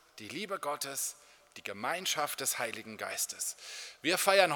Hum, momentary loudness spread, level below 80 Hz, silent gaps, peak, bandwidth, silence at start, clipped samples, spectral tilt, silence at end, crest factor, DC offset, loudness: none; 14 LU; -84 dBFS; none; -10 dBFS; 19 kHz; 0.15 s; under 0.1%; -1 dB/octave; 0 s; 24 dB; under 0.1%; -34 LUFS